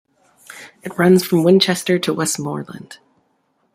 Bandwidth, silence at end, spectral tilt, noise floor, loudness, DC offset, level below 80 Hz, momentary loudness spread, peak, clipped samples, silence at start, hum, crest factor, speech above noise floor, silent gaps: 16 kHz; 0.8 s; -5 dB/octave; -65 dBFS; -16 LUFS; under 0.1%; -62 dBFS; 22 LU; -2 dBFS; under 0.1%; 0.5 s; none; 18 dB; 48 dB; none